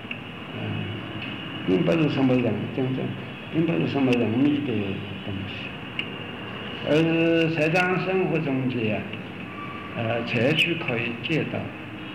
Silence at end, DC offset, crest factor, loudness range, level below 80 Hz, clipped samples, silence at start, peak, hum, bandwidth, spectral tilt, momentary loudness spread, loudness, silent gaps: 0 s; 0.2%; 14 dB; 2 LU; -58 dBFS; under 0.1%; 0 s; -10 dBFS; none; 13.5 kHz; -7 dB/octave; 13 LU; -25 LUFS; none